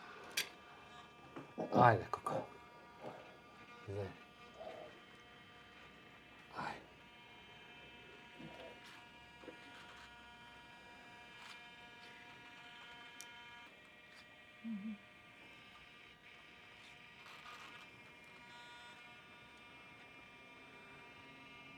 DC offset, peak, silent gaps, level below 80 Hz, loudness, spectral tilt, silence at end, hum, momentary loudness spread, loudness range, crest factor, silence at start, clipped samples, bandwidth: under 0.1%; -14 dBFS; none; -78 dBFS; -44 LUFS; -5 dB/octave; 0 s; none; 15 LU; 17 LU; 32 dB; 0 s; under 0.1%; 19.5 kHz